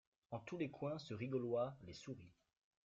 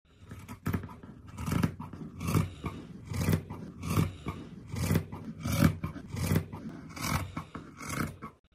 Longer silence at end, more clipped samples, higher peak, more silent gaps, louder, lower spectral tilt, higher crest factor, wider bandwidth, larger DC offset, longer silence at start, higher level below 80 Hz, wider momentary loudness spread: first, 0.55 s vs 0.25 s; neither; second, -30 dBFS vs -10 dBFS; neither; second, -46 LUFS vs -34 LUFS; about the same, -6.5 dB/octave vs -6 dB/octave; second, 16 dB vs 24 dB; second, 7.8 kHz vs 15.5 kHz; neither; about the same, 0.3 s vs 0.2 s; second, -78 dBFS vs -48 dBFS; about the same, 13 LU vs 14 LU